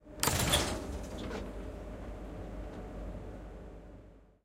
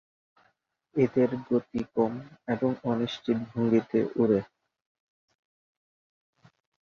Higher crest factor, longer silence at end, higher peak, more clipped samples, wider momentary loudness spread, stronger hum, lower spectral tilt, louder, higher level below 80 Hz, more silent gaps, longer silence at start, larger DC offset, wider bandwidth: first, 32 dB vs 18 dB; second, 0.15 s vs 2.4 s; first, -6 dBFS vs -12 dBFS; neither; first, 21 LU vs 8 LU; neither; second, -3 dB/octave vs -8 dB/octave; second, -36 LUFS vs -28 LUFS; first, -46 dBFS vs -64 dBFS; neither; second, 0 s vs 0.95 s; neither; first, 16 kHz vs 6.8 kHz